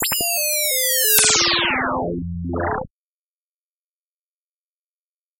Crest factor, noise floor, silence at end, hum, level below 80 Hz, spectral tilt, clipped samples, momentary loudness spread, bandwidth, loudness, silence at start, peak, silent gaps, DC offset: 22 dB; under -90 dBFS; 2.55 s; none; -46 dBFS; -1.5 dB/octave; under 0.1%; 14 LU; 16.5 kHz; -17 LUFS; 0 s; 0 dBFS; none; under 0.1%